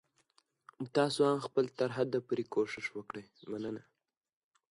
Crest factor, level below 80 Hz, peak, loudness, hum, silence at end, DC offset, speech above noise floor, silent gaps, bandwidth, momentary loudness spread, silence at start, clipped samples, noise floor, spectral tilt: 20 dB; -78 dBFS; -16 dBFS; -34 LUFS; none; 0.9 s; under 0.1%; 39 dB; none; 11.5 kHz; 16 LU; 0.8 s; under 0.1%; -73 dBFS; -5.5 dB/octave